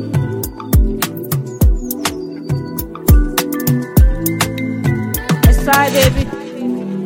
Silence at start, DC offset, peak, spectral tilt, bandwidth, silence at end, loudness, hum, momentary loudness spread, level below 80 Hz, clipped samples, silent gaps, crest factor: 0 s; under 0.1%; 0 dBFS; -5.5 dB/octave; 17 kHz; 0 s; -16 LUFS; none; 10 LU; -18 dBFS; under 0.1%; none; 14 dB